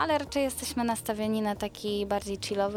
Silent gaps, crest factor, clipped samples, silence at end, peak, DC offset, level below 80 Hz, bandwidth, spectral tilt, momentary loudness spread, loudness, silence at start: none; 16 dB; under 0.1%; 0 s; -14 dBFS; under 0.1%; -52 dBFS; 17.5 kHz; -4 dB/octave; 4 LU; -30 LUFS; 0 s